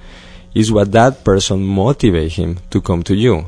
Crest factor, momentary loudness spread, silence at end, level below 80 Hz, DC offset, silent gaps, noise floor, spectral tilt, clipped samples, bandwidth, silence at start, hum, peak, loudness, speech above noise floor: 14 dB; 8 LU; 0 s; -30 dBFS; under 0.1%; none; -36 dBFS; -6 dB/octave; under 0.1%; 10.5 kHz; 0 s; none; 0 dBFS; -14 LUFS; 23 dB